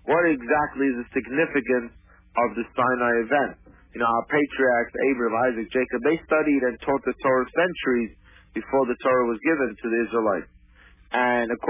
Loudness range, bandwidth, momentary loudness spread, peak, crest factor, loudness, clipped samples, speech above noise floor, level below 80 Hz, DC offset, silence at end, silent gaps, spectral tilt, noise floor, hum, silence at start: 2 LU; 3.8 kHz; 5 LU; -10 dBFS; 14 dB; -23 LUFS; under 0.1%; 30 dB; -54 dBFS; under 0.1%; 0 s; none; -9.5 dB/octave; -53 dBFS; none; 0.05 s